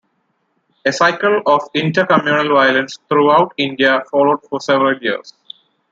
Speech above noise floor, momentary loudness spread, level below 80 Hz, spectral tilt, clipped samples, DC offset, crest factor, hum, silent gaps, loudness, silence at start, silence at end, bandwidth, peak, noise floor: 51 dB; 8 LU; -64 dBFS; -5 dB/octave; under 0.1%; under 0.1%; 16 dB; none; none; -14 LUFS; 0.85 s; 0.6 s; 7.8 kHz; 0 dBFS; -66 dBFS